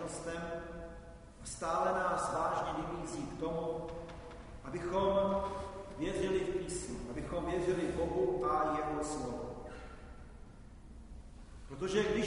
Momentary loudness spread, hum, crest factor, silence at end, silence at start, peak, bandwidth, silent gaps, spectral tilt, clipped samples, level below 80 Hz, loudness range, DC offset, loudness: 21 LU; none; 18 dB; 0 s; 0 s; -20 dBFS; 11 kHz; none; -5 dB/octave; under 0.1%; -52 dBFS; 4 LU; under 0.1%; -36 LUFS